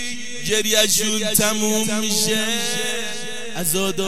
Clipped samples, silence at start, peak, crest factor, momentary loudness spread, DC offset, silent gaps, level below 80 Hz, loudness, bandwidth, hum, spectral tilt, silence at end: under 0.1%; 0 s; -2 dBFS; 20 dB; 11 LU; 4%; none; -56 dBFS; -19 LUFS; 16 kHz; none; -2 dB/octave; 0 s